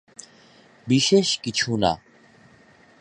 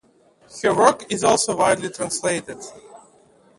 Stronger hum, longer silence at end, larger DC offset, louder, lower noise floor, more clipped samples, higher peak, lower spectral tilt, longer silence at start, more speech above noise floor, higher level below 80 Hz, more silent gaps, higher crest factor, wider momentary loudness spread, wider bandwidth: neither; first, 1.05 s vs 0.6 s; neither; about the same, -21 LUFS vs -20 LUFS; about the same, -54 dBFS vs -56 dBFS; neither; second, -6 dBFS vs 0 dBFS; about the same, -4 dB/octave vs -3 dB/octave; first, 0.85 s vs 0.55 s; about the same, 33 dB vs 36 dB; first, -54 dBFS vs -60 dBFS; neither; about the same, 20 dB vs 22 dB; first, 25 LU vs 20 LU; about the same, 11.5 kHz vs 11.5 kHz